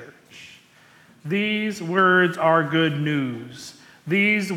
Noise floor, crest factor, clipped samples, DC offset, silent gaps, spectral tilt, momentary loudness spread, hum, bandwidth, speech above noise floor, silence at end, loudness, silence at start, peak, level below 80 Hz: -53 dBFS; 16 dB; under 0.1%; under 0.1%; none; -6 dB/octave; 22 LU; none; 15 kHz; 32 dB; 0 s; -21 LUFS; 0 s; -6 dBFS; -70 dBFS